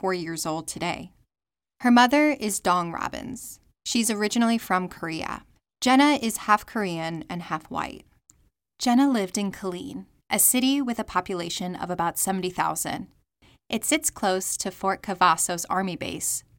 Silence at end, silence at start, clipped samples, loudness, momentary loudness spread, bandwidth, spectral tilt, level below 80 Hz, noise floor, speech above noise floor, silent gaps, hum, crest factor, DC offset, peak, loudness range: 0.2 s; 0.05 s; under 0.1%; -24 LUFS; 14 LU; 17 kHz; -3 dB/octave; -58 dBFS; under -90 dBFS; over 65 dB; none; none; 20 dB; under 0.1%; -6 dBFS; 4 LU